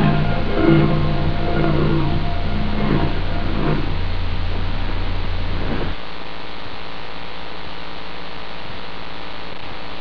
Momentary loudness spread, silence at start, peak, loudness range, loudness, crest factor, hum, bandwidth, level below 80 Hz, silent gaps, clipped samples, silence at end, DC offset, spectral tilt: 14 LU; 0 s; -2 dBFS; 12 LU; -23 LUFS; 18 dB; none; 5.4 kHz; -24 dBFS; none; under 0.1%; 0 s; 9%; -8.5 dB/octave